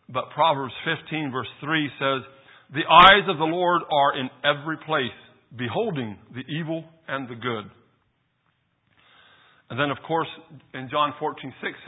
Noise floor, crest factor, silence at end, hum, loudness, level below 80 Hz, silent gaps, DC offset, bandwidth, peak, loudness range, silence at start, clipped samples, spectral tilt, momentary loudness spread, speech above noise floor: -70 dBFS; 24 dB; 0.05 s; none; -23 LUFS; -56 dBFS; none; under 0.1%; 8 kHz; 0 dBFS; 15 LU; 0.1 s; under 0.1%; -7 dB/octave; 16 LU; 47 dB